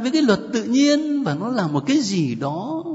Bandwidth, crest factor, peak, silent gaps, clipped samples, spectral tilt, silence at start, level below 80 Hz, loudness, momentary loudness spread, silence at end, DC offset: 8 kHz; 16 dB; -4 dBFS; none; under 0.1%; -5.5 dB/octave; 0 s; -62 dBFS; -20 LUFS; 7 LU; 0 s; under 0.1%